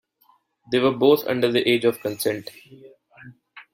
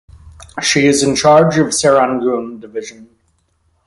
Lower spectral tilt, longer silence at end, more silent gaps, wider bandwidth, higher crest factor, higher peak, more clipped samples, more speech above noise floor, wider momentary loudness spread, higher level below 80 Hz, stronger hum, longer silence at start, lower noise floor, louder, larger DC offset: about the same, -5 dB/octave vs -4 dB/octave; second, 0.1 s vs 0.85 s; neither; first, 16.5 kHz vs 11.5 kHz; about the same, 18 dB vs 14 dB; second, -4 dBFS vs 0 dBFS; neither; second, 41 dB vs 47 dB; second, 8 LU vs 17 LU; second, -66 dBFS vs -46 dBFS; neither; first, 0.7 s vs 0.25 s; about the same, -62 dBFS vs -61 dBFS; second, -21 LUFS vs -12 LUFS; neither